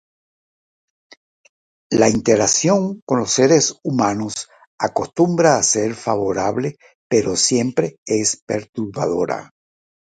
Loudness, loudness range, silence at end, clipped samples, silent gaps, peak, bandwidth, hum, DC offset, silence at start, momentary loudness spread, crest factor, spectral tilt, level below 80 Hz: -18 LUFS; 3 LU; 0.65 s; under 0.1%; 3.02-3.07 s, 4.67-4.78 s, 6.95-7.10 s, 7.98-8.06 s, 8.42-8.47 s, 8.69-8.73 s; 0 dBFS; 10 kHz; none; under 0.1%; 1.9 s; 11 LU; 20 dB; -4 dB/octave; -54 dBFS